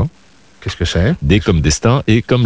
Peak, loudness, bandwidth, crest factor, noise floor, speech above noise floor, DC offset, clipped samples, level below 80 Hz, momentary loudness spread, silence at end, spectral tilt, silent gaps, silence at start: 0 dBFS; -14 LUFS; 8 kHz; 14 dB; -48 dBFS; 35 dB; under 0.1%; under 0.1%; -24 dBFS; 11 LU; 0 s; -5.5 dB/octave; none; 0 s